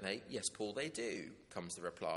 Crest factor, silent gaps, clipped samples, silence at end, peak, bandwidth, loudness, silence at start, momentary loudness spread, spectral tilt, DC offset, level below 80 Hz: 20 dB; none; under 0.1%; 0 s; -22 dBFS; 11.5 kHz; -43 LUFS; 0 s; 8 LU; -3 dB/octave; under 0.1%; -76 dBFS